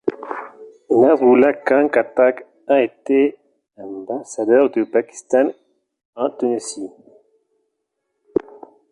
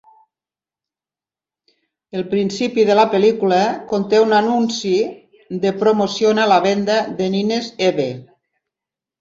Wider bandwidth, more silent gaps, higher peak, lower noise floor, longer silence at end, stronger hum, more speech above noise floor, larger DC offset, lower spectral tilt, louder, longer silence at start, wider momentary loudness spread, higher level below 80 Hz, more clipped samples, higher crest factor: first, 11 kHz vs 7.8 kHz; first, 6.05-6.13 s vs none; about the same, -2 dBFS vs -2 dBFS; second, -75 dBFS vs under -90 dBFS; first, 2.05 s vs 1 s; neither; second, 58 dB vs over 74 dB; neither; about the same, -5 dB/octave vs -5 dB/octave; about the same, -18 LUFS vs -17 LUFS; second, 0.05 s vs 2.15 s; first, 18 LU vs 9 LU; about the same, -66 dBFS vs -62 dBFS; neither; about the same, 16 dB vs 16 dB